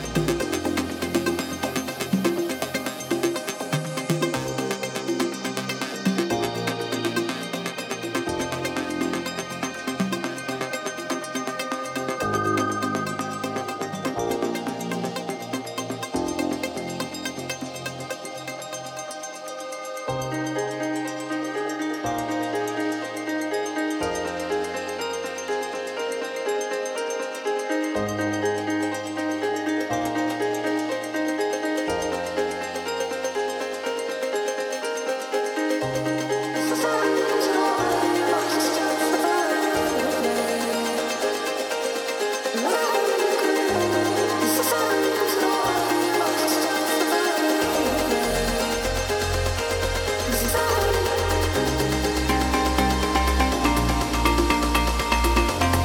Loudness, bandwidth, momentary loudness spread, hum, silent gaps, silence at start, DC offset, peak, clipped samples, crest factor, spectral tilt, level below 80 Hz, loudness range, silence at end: -25 LUFS; 19 kHz; 8 LU; none; none; 0 s; under 0.1%; -4 dBFS; under 0.1%; 20 dB; -4 dB/octave; -38 dBFS; 7 LU; 0 s